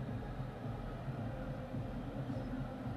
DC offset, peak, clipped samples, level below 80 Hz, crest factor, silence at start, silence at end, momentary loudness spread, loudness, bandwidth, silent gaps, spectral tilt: under 0.1%; -30 dBFS; under 0.1%; -50 dBFS; 12 dB; 0 s; 0 s; 2 LU; -43 LUFS; 13 kHz; none; -8.5 dB/octave